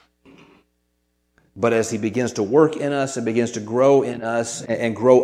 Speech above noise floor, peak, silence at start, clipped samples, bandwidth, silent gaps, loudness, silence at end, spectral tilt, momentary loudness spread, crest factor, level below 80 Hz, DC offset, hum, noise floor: 50 dB; 0 dBFS; 1.55 s; under 0.1%; 13.5 kHz; none; -20 LUFS; 0 s; -5.5 dB/octave; 8 LU; 20 dB; -64 dBFS; under 0.1%; 60 Hz at -55 dBFS; -69 dBFS